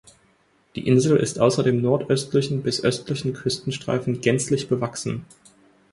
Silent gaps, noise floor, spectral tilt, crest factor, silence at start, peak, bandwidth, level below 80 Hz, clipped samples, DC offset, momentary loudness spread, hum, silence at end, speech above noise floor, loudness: none; -62 dBFS; -5.5 dB/octave; 20 dB; 0.75 s; -4 dBFS; 11.5 kHz; -56 dBFS; under 0.1%; under 0.1%; 9 LU; none; 0.7 s; 40 dB; -22 LUFS